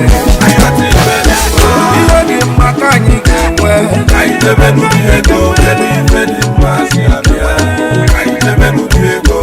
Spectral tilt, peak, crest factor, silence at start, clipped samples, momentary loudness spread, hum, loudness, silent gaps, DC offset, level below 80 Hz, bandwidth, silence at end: -5 dB/octave; 0 dBFS; 8 dB; 0 s; 2%; 3 LU; none; -8 LUFS; none; under 0.1%; -12 dBFS; 16.5 kHz; 0 s